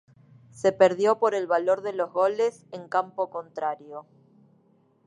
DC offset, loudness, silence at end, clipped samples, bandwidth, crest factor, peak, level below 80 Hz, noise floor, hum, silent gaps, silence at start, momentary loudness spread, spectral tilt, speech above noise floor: under 0.1%; -25 LUFS; 1.05 s; under 0.1%; 10.5 kHz; 22 dB; -4 dBFS; -76 dBFS; -63 dBFS; none; none; 0.55 s; 14 LU; -5 dB/octave; 38 dB